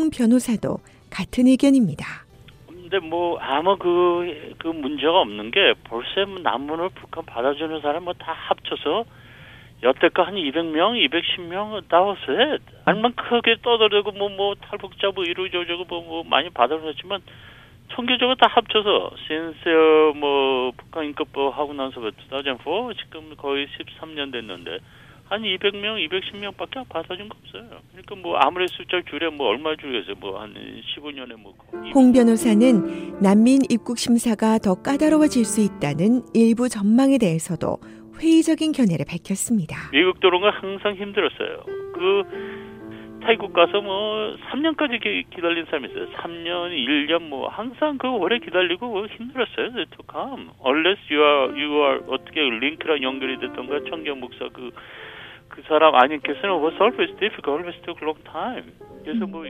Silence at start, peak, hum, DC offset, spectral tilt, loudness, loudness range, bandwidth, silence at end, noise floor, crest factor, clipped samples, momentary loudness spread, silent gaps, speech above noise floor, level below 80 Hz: 0 s; 0 dBFS; none; under 0.1%; -4.5 dB/octave; -21 LUFS; 8 LU; 15.5 kHz; 0 s; -46 dBFS; 22 dB; under 0.1%; 16 LU; none; 25 dB; -56 dBFS